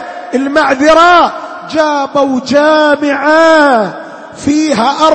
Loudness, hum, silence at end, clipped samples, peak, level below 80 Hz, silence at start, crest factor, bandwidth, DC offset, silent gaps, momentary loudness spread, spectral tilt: -9 LUFS; none; 0 s; 0.3%; 0 dBFS; -46 dBFS; 0 s; 10 dB; 8.8 kHz; under 0.1%; none; 12 LU; -4 dB/octave